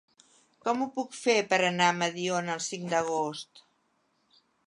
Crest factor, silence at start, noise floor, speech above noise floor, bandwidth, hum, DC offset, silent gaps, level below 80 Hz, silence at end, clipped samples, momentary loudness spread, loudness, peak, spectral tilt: 22 dB; 0.65 s; -72 dBFS; 44 dB; 11.5 kHz; none; under 0.1%; none; -76 dBFS; 1.05 s; under 0.1%; 10 LU; -28 LUFS; -8 dBFS; -3.5 dB/octave